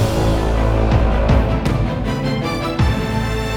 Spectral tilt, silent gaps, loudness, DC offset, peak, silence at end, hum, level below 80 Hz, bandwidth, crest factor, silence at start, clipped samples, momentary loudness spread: -7 dB/octave; none; -18 LUFS; under 0.1%; -2 dBFS; 0 s; none; -20 dBFS; 15.5 kHz; 14 dB; 0 s; under 0.1%; 4 LU